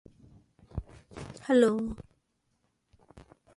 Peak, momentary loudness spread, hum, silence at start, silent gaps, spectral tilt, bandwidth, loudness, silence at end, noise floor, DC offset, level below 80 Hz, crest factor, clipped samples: -12 dBFS; 22 LU; none; 0.75 s; none; -6.5 dB/octave; 11.5 kHz; -27 LUFS; 0.35 s; -76 dBFS; under 0.1%; -54 dBFS; 22 dB; under 0.1%